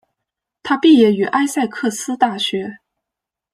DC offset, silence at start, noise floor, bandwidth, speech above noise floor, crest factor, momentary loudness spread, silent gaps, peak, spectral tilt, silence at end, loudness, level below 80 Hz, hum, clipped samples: under 0.1%; 0.65 s; -84 dBFS; 15 kHz; 69 dB; 16 dB; 13 LU; none; -2 dBFS; -4 dB/octave; 0.8 s; -16 LUFS; -64 dBFS; none; under 0.1%